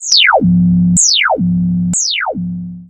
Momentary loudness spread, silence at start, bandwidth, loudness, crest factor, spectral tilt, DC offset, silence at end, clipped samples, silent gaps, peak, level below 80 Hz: 10 LU; 0 s; 9.4 kHz; -11 LUFS; 12 dB; -3 dB/octave; under 0.1%; 0.05 s; under 0.1%; none; 0 dBFS; -38 dBFS